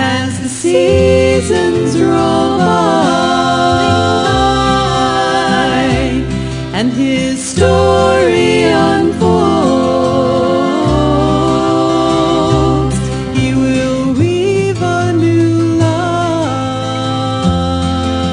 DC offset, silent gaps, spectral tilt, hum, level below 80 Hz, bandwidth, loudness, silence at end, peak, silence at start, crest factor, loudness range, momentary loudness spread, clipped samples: under 0.1%; none; -5.5 dB/octave; none; -30 dBFS; 10.5 kHz; -12 LUFS; 0 s; 0 dBFS; 0 s; 12 dB; 2 LU; 6 LU; under 0.1%